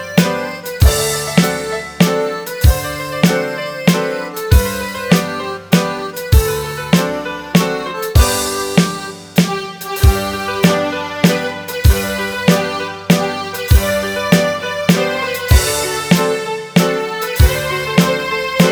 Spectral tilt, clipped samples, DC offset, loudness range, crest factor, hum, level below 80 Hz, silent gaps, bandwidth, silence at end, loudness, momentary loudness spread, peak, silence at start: -5 dB/octave; 0.1%; under 0.1%; 1 LU; 14 dB; none; -20 dBFS; none; over 20 kHz; 0 s; -15 LUFS; 7 LU; 0 dBFS; 0 s